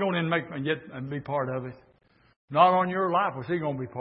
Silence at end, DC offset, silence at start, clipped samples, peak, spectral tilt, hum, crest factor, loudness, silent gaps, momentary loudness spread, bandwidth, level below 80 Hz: 0 s; under 0.1%; 0 s; under 0.1%; -6 dBFS; -10.5 dB/octave; none; 20 dB; -27 LUFS; 2.36-2.48 s; 14 LU; 5.4 kHz; -66 dBFS